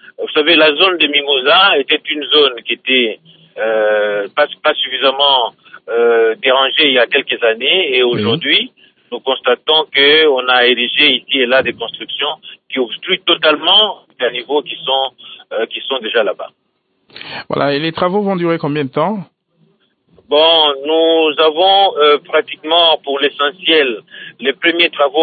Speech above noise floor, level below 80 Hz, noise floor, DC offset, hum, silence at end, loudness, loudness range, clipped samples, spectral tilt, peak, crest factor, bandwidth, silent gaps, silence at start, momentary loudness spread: 43 dB; -64 dBFS; -57 dBFS; under 0.1%; none; 0 s; -12 LUFS; 7 LU; under 0.1%; -9 dB/octave; 0 dBFS; 14 dB; 4.8 kHz; none; 0.2 s; 11 LU